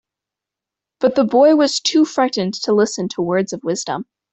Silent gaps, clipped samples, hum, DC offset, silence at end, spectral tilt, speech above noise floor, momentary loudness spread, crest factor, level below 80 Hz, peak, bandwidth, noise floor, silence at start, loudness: none; under 0.1%; none; under 0.1%; 0.3 s; -4.5 dB/octave; 69 dB; 10 LU; 14 dB; -62 dBFS; -4 dBFS; 8.4 kHz; -86 dBFS; 1 s; -17 LUFS